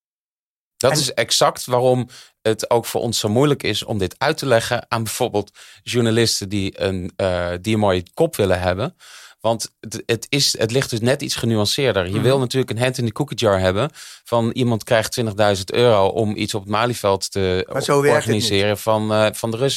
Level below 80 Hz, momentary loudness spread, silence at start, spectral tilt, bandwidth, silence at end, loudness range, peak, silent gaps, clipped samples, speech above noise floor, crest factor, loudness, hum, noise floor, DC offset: -52 dBFS; 7 LU; 0.8 s; -4.5 dB/octave; 16.5 kHz; 0 s; 2 LU; -4 dBFS; none; under 0.1%; over 71 dB; 16 dB; -19 LUFS; none; under -90 dBFS; under 0.1%